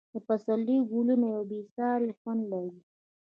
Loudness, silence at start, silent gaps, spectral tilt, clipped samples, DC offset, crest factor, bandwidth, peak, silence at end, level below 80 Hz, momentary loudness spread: -30 LUFS; 0.15 s; 1.71-1.76 s, 2.17-2.25 s; -9.5 dB/octave; under 0.1%; under 0.1%; 14 dB; 4.3 kHz; -16 dBFS; 0.45 s; -84 dBFS; 9 LU